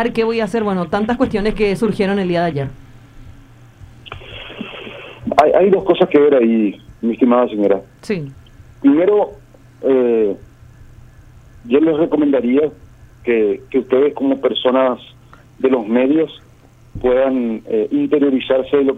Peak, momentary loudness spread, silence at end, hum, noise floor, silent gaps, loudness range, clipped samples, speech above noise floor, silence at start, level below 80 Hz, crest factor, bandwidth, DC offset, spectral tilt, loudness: 0 dBFS; 15 LU; 0 s; none; -46 dBFS; none; 5 LU; under 0.1%; 31 dB; 0 s; -42 dBFS; 16 dB; 10.5 kHz; under 0.1%; -7.5 dB/octave; -16 LUFS